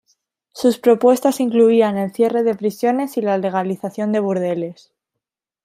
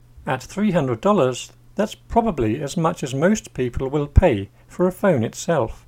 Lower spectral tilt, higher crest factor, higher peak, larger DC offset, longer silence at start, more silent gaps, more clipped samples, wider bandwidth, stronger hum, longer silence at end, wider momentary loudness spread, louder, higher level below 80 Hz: about the same, -6 dB/octave vs -6.5 dB/octave; about the same, 16 dB vs 20 dB; about the same, -2 dBFS vs 0 dBFS; neither; first, 0.55 s vs 0.15 s; neither; neither; about the same, 16 kHz vs 16.5 kHz; neither; first, 0.9 s vs 0.1 s; about the same, 9 LU vs 9 LU; first, -18 LUFS vs -21 LUFS; second, -68 dBFS vs -30 dBFS